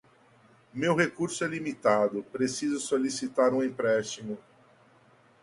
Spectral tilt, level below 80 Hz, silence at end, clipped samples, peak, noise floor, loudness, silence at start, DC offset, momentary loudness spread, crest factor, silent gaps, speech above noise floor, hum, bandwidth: -4.5 dB/octave; -72 dBFS; 1 s; under 0.1%; -8 dBFS; -60 dBFS; -28 LUFS; 0.75 s; under 0.1%; 11 LU; 22 dB; none; 32 dB; none; 11.5 kHz